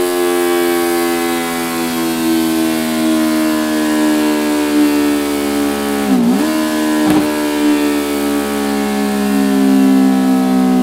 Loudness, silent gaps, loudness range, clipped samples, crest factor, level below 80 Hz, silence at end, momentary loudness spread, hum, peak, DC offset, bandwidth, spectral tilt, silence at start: -14 LUFS; none; 1 LU; under 0.1%; 14 dB; -46 dBFS; 0 s; 4 LU; none; 0 dBFS; under 0.1%; 16 kHz; -4.5 dB/octave; 0 s